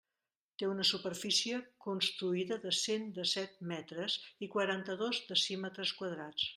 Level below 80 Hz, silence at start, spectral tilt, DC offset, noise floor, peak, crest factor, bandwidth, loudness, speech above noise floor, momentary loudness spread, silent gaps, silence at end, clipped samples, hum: -82 dBFS; 0.6 s; -3 dB/octave; under 0.1%; under -90 dBFS; -16 dBFS; 20 dB; 13.5 kHz; -35 LUFS; over 53 dB; 9 LU; none; 0 s; under 0.1%; none